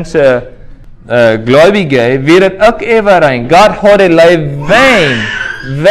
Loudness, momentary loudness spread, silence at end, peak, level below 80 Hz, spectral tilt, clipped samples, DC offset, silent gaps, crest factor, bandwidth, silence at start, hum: -7 LUFS; 8 LU; 0 s; 0 dBFS; -34 dBFS; -5.5 dB/octave; 4%; under 0.1%; none; 8 dB; 14.5 kHz; 0 s; none